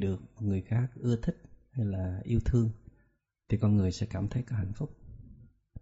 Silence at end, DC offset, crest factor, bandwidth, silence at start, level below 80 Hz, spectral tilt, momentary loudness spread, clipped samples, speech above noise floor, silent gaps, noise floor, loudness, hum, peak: 0 s; under 0.1%; 16 dB; 8 kHz; 0 s; -46 dBFS; -9 dB/octave; 16 LU; under 0.1%; 41 dB; none; -71 dBFS; -32 LUFS; none; -16 dBFS